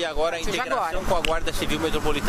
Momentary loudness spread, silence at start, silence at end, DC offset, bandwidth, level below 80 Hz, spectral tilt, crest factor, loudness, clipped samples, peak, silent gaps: 2 LU; 0 s; 0 s; under 0.1%; 15.5 kHz; -32 dBFS; -3.5 dB/octave; 16 dB; -25 LUFS; under 0.1%; -6 dBFS; none